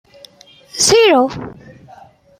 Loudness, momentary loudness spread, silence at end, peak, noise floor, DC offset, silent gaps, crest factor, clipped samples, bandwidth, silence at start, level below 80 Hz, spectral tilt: -12 LUFS; 21 LU; 0.85 s; -2 dBFS; -44 dBFS; under 0.1%; none; 16 dB; under 0.1%; 15 kHz; 0.75 s; -50 dBFS; -2 dB/octave